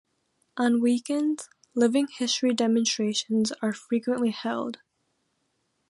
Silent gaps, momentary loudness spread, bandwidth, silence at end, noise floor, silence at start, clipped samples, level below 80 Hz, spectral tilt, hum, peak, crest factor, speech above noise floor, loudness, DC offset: none; 10 LU; 11.5 kHz; 1.15 s; -75 dBFS; 0.55 s; under 0.1%; -76 dBFS; -3.5 dB/octave; none; -10 dBFS; 16 dB; 49 dB; -26 LUFS; under 0.1%